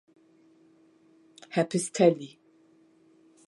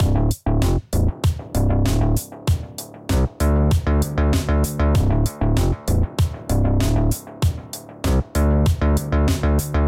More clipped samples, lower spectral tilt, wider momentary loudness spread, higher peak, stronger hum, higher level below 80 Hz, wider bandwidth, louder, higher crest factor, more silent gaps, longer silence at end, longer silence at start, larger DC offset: neither; about the same, -5.5 dB/octave vs -6.5 dB/octave; first, 14 LU vs 5 LU; about the same, -8 dBFS vs -8 dBFS; neither; second, -82 dBFS vs -22 dBFS; second, 11.5 kHz vs 16.5 kHz; second, -26 LUFS vs -20 LUFS; first, 24 dB vs 12 dB; neither; first, 1.2 s vs 0 s; first, 1.5 s vs 0 s; neither